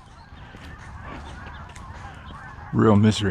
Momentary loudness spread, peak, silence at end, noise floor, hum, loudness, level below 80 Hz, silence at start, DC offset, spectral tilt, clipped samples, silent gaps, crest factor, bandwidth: 24 LU; -4 dBFS; 0 s; -44 dBFS; none; -19 LUFS; -44 dBFS; 0.3 s; under 0.1%; -7 dB/octave; under 0.1%; none; 20 dB; 10.5 kHz